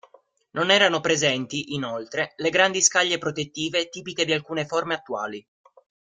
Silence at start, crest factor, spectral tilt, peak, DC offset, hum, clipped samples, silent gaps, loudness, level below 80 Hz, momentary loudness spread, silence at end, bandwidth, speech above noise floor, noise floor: 0.55 s; 22 dB; -2 dB/octave; -2 dBFS; under 0.1%; none; under 0.1%; none; -23 LUFS; -66 dBFS; 13 LU; 0.8 s; 11 kHz; 34 dB; -58 dBFS